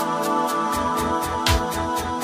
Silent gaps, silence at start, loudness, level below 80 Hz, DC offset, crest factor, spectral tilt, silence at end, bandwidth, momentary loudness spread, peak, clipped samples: none; 0 s; -22 LUFS; -34 dBFS; under 0.1%; 16 dB; -4 dB/octave; 0 s; 16 kHz; 3 LU; -6 dBFS; under 0.1%